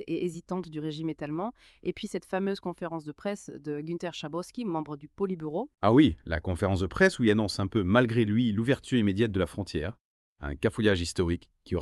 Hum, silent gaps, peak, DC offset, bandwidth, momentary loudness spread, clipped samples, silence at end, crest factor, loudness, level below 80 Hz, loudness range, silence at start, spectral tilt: none; 10.00-10.36 s; -8 dBFS; under 0.1%; 12.5 kHz; 13 LU; under 0.1%; 0 s; 20 dB; -29 LUFS; -50 dBFS; 9 LU; 0 s; -6.5 dB/octave